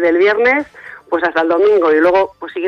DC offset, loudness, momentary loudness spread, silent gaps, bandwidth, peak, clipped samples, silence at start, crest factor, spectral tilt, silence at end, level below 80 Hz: under 0.1%; -13 LUFS; 9 LU; none; 6.6 kHz; -2 dBFS; under 0.1%; 0 s; 12 dB; -5.5 dB/octave; 0 s; -54 dBFS